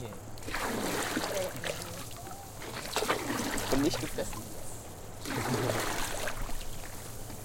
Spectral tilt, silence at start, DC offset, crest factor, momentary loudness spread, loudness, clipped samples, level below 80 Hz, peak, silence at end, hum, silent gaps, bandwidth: -3.5 dB/octave; 0 s; under 0.1%; 20 dB; 12 LU; -35 LUFS; under 0.1%; -44 dBFS; -14 dBFS; 0 s; none; none; 17 kHz